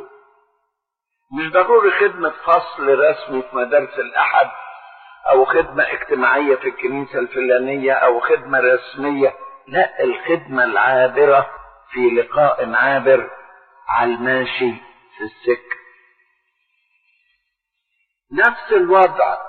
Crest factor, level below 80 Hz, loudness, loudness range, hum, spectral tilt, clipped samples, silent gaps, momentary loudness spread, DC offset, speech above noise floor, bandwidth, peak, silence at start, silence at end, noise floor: 16 dB; -58 dBFS; -16 LUFS; 7 LU; none; -2.5 dB/octave; under 0.1%; none; 12 LU; under 0.1%; 62 dB; 4.5 kHz; -2 dBFS; 0 s; 0 s; -78 dBFS